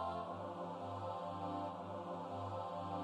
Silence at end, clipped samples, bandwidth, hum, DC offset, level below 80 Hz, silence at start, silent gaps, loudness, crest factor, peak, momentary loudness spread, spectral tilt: 0 s; under 0.1%; 11 kHz; none; under 0.1%; -78 dBFS; 0 s; none; -45 LUFS; 14 dB; -30 dBFS; 2 LU; -7.5 dB/octave